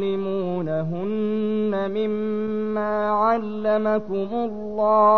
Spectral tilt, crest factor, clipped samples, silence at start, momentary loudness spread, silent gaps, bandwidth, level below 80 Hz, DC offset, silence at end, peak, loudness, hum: -9 dB/octave; 14 dB; under 0.1%; 0 s; 6 LU; none; 6 kHz; -56 dBFS; 1%; 0 s; -8 dBFS; -24 LUFS; none